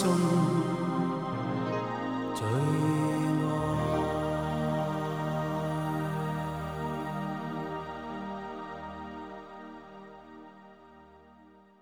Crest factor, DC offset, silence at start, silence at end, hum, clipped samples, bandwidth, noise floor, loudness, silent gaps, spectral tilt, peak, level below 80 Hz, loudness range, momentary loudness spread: 16 dB; under 0.1%; 0 s; 0.3 s; 50 Hz at -60 dBFS; under 0.1%; 16.5 kHz; -57 dBFS; -31 LUFS; none; -7 dB/octave; -14 dBFS; -54 dBFS; 13 LU; 18 LU